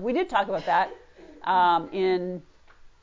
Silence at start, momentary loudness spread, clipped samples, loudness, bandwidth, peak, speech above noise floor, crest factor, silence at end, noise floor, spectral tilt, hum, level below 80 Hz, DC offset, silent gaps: 0 s; 13 LU; under 0.1%; -25 LUFS; 7.6 kHz; -10 dBFS; 27 dB; 16 dB; 0.15 s; -51 dBFS; -6 dB/octave; none; -60 dBFS; under 0.1%; none